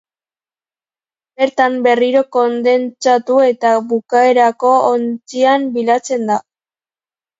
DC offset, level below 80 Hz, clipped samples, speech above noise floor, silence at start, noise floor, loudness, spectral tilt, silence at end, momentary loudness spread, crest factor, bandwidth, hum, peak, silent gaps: under 0.1%; -68 dBFS; under 0.1%; over 77 dB; 1.4 s; under -90 dBFS; -14 LUFS; -4 dB/octave; 1 s; 6 LU; 14 dB; 7.8 kHz; none; 0 dBFS; none